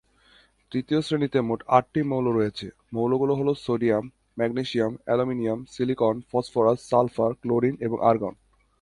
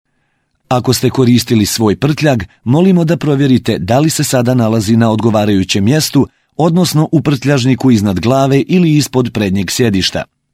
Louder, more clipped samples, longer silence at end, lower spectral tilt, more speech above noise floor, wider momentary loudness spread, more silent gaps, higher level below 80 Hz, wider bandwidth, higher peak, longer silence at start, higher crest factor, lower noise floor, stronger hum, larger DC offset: second, -25 LUFS vs -12 LUFS; neither; first, 0.5 s vs 0.3 s; first, -7.5 dB/octave vs -5.5 dB/octave; second, 35 dB vs 51 dB; first, 7 LU vs 4 LU; neither; second, -58 dBFS vs -42 dBFS; second, 11.5 kHz vs 16.5 kHz; second, -4 dBFS vs 0 dBFS; about the same, 0.7 s vs 0.7 s; first, 22 dB vs 12 dB; about the same, -59 dBFS vs -62 dBFS; neither; neither